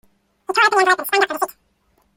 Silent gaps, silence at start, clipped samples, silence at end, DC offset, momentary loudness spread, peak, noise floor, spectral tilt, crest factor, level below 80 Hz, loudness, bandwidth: none; 0.5 s; under 0.1%; 0.65 s; under 0.1%; 12 LU; -2 dBFS; -63 dBFS; -0.5 dB/octave; 18 dB; -66 dBFS; -17 LUFS; 16.5 kHz